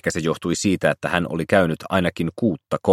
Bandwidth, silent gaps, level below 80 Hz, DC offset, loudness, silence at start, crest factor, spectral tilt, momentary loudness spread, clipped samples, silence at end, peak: 16.5 kHz; none; -50 dBFS; under 0.1%; -21 LUFS; 0.05 s; 20 dB; -5.5 dB/octave; 5 LU; under 0.1%; 0 s; 0 dBFS